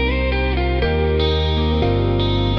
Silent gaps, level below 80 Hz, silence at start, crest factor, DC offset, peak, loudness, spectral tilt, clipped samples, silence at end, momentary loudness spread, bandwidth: none; -24 dBFS; 0 s; 12 dB; under 0.1%; -6 dBFS; -19 LUFS; -8 dB/octave; under 0.1%; 0 s; 2 LU; 6 kHz